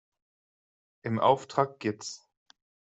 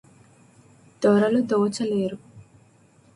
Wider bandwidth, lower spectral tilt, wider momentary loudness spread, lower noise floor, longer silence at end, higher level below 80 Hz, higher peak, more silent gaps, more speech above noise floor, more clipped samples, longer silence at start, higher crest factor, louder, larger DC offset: second, 8.2 kHz vs 11.5 kHz; about the same, -5.5 dB/octave vs -6.5 dB/octave; first, 16 LU vs 10 LU; first, under -90 dBFS vs -56 dBFS; about the same, 0.8 s vs 0.75 s; second, -74 dBFS vs -66 dBFS; about the same, -8 dBFS vs -8 dBFS; neither; first, over 62 dB vs 35 dB; neither; about the same, 1.05 s vs 1 s; first, 24 dB vs 18 dB; second, -29 LUFS vs -22 LUFS; neither